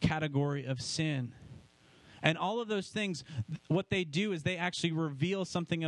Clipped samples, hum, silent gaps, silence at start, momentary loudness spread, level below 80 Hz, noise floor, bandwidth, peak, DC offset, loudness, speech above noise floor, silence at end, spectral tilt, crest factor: under 0.1%; none; none; 0 s; 7 LU; -58 dBFS; -61 dBFS; 11 kHz; -10 dBFS; under 0.1%; -34 LUFS; 27 dB; 0 s; -5.5 dB/octave; 24 dB